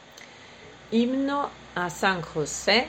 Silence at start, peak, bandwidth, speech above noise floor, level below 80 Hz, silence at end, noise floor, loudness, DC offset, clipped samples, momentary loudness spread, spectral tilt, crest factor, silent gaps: 0.05 s; -8 dBFS; 16.5 kHz; 22 dB; -56 dBFS; 0 s; -47 dBFS; -26 LUFS; under 0.1%; under 0.1%; 21 LU; -3.5 dB/octave; 20 dB; none